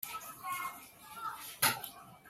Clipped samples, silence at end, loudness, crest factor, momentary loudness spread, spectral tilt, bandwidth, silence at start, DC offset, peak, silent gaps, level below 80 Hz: under 0.1%; 0 s; -36 LUFS; 24 dB; 16 LU; -0.5 dB/octave; 16 kHz; 0 s; under 0.1%; -14 dBFS; none; -74 dBFS